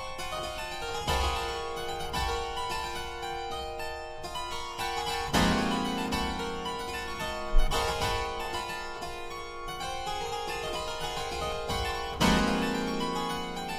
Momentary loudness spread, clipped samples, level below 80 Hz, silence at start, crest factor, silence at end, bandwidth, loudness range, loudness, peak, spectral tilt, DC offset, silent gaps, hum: 10 LU; under 0.1%; -40 dBFS; 0 s; 20 dB; 0 s; 15.5 kHz; 4 LU; -32 LUFS; -10 dBFS; -4 dB/octave; under 0.1%; none; none